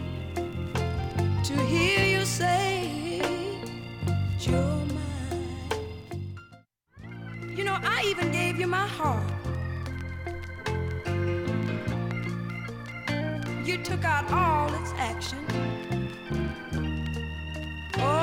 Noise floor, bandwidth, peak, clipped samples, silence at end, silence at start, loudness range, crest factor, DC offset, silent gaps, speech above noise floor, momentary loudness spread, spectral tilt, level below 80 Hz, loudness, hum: -56 dBFS; 17 kHz; -12 dBFS; under 0.1%; 0 s; 0 s; 5 LU; 16 dB; under 0.1%; none; 31 dB; 11 LU; -5.5 dB/octave; -44 dBFS; -29 LUFS; none